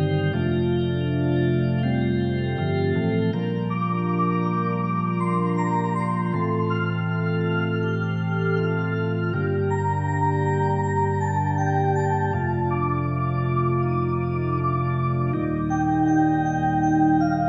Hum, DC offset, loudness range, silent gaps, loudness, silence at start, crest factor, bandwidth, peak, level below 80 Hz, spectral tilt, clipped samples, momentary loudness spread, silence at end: none; 0.2%; 1 LU; none; -23 LUFS; 0 s; 12 dB; 8 kHz; -10 dBFS; -48 dBFS; -8.5 dB/octave; under 0.1%; 3 LU; 0 s